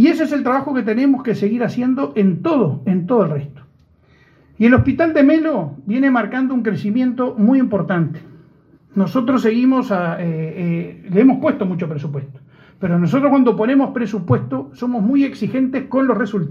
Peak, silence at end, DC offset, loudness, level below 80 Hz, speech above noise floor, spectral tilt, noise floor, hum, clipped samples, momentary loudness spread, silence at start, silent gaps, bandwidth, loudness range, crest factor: 0 dBFS; 0 s; under 0.1%; -17 LUFS; -52 dBFS; 36 dB; -9 dB/octave; -52 dBFS; none; under 0.1%; 9 LU; 0 s; none; 7.2 kHz; 3 LU; 16 dB